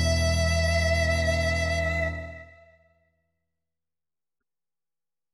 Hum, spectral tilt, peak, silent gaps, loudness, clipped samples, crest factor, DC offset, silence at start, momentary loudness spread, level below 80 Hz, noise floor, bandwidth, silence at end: none; -4.5 dB/octave; -12 dBFS; none; -25 LUFS; under 0.1%; 16 dB; under 0.1%; 0 s; 12 LU; -34 dBFS; under -90 dBFS; 14 kHz; 2.9 s